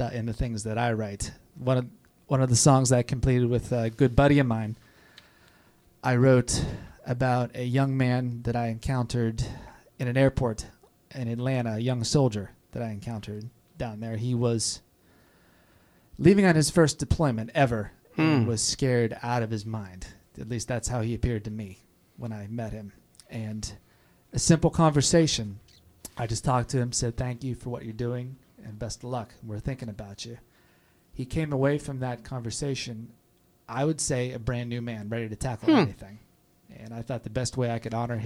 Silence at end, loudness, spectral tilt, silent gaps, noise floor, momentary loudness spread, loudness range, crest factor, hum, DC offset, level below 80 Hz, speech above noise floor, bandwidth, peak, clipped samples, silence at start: 0 s; -27 LUFS; -5.5 dB/octave; none; -62 dBFS; 18 LU; 9 LU; 22 dB; none; under 0.1%; -46 dBFS; 36 dB; 13.5 kHz; -4 dBFS; under 0.1%; 0 s